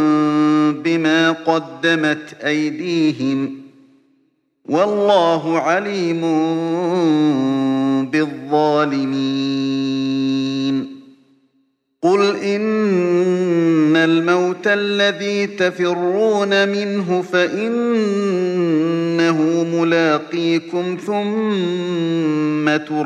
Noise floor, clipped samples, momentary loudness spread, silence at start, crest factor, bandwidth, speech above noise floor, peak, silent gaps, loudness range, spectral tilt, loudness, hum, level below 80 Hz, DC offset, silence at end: -64 dBFS; under 0.1%; 6 LU; 0 s; 16 dB; 9.2 kHz; 47 dB; -2 dBFS; none; 4 LU; -6 dB/octave; -17 LUFS; none; -70 dBFS; under 0.1%; 0 s